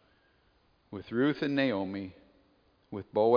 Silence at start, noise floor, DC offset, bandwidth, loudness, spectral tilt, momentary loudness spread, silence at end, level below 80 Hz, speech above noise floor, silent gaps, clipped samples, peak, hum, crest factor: 0.9 s; -68 dBFS; under 0.1%; 5.2 kHz; -31 LUFS; -5 dB/octave; 17 LU; 0 s; -70 dBFS; 39 dB; none; under 0.1%; -12 dBFS; none; 20 dB